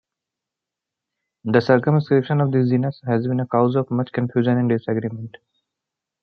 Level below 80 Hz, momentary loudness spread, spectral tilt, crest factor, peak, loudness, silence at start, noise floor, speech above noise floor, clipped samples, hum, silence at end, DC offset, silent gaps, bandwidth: -64 dBFS; 8 LU; -10 dB/octave; 20 dB; -2 dBFS; -20 LUFS; 1.45 s; -86 dBFS; 66 dB; under 0.1%; none; 0.95 s; under 0.1%; none; 6.4 kHz